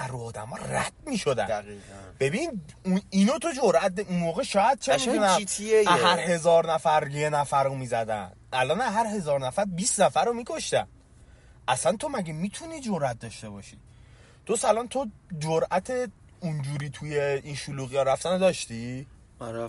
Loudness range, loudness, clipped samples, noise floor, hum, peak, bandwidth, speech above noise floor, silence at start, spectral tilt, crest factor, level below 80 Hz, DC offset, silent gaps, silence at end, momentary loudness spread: 7 LU; -26 LUFS; under 0.1%; -53 dBFS; none; -8 dBFS; 11.5 kHz; 27 dB; 0 s; -4.5 dB/octave; 20 dB; -56 dBFS; under 0.1%; none; 0 s; 14 LU